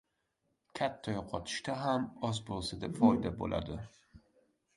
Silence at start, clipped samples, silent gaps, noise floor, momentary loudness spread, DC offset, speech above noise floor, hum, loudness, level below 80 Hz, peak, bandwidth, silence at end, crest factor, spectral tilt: 0.75 s; under 0.1%; none; -81 dBFS; 13 LU; under 0.1%; 46 dB; none; -35 LUFS; -56 dBFS; -12 dBFS; 11.5 kHz; 0.6 s; 24 dB; -5.5 dB/octave